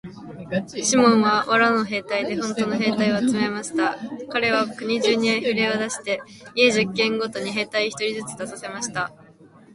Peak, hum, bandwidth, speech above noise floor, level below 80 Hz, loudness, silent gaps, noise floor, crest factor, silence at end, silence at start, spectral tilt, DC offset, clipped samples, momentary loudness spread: -4 dBFS; none; 11.5 kHz; 27 dB; -62 dBFS; -22 LUFS; none; -49 dBFS; 20 dB; 0.3 s; 0.05 s; -3.5 dB/octave; under 0.1%; under 0.1%; 12 LU